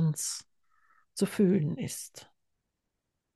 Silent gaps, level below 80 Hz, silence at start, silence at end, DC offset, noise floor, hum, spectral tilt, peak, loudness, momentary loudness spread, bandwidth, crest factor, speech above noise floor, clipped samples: none; -74 dBFS; 0 s; 1.1 s; under 0.1%; -84 dBFS; none; -5.5 dB/octave; -14 dBFS; -30 LUFS; 18 LU; 12.5 kHz; 18 dB; 54 dB; under 0.1%